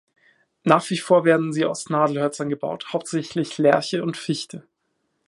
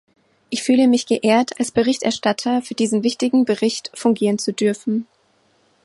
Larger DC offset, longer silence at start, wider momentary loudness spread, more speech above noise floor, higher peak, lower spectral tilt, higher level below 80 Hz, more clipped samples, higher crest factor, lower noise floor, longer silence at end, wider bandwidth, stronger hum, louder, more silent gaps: neither; first, 0.65 s vs 0.5 s; first, 10 LU vs 6 LU; first, 52 dB vs 42 dB; about the same, 0 dBFS vs -2 dBFS; about the same, -5.5 dB/octave vs -4.5 dB/octave; second, -72 dBFS vs -62 dBFS; neither; first, 22 dB vs 16 dB; first, -73 dBFS vs -60 dBFS; about the same, 0.7 s vs 0.8 s; about the same, 11.5 kHz vs 11.5 kHz; neither; second, -22 LUFS vs -19 LUFS; neither